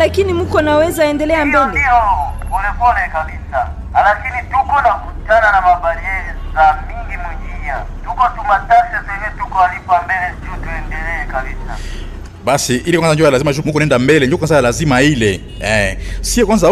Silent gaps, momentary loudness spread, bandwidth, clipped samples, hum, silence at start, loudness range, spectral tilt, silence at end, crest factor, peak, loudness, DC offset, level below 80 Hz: none; 13 LU; 14 kHz; under 0.1%; none; 0 s; 5 LU; -5 dB/octave; 0 s; 12 dB; -2 dBFS; -14 LUFS; under 0.1%; -26 dBFS